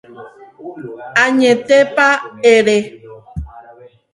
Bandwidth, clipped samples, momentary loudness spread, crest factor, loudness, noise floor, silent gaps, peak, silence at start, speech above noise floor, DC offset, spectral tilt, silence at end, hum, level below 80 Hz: 11.5 kHz; under 0.1%; 21 LU; 16 dB; -12 LUFS; -42 dBFS; none; 0 dBFS; 0.2 s; 29 dB; under 0.1%; -4 dB/octave; 0.55 s; none; -40 dBFS